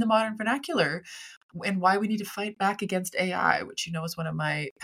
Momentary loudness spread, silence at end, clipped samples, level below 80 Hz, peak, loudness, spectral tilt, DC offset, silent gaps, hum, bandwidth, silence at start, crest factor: 9 LU; 0 s; under 0.1%; -68 dBFS; -6 dBFS; -28 LUFS; -4.5 dB/octave; under 0.1%; 1.37-1.49 s, 4.71-4.76 s; none; 16.5 kHz; 0 s; 22 dB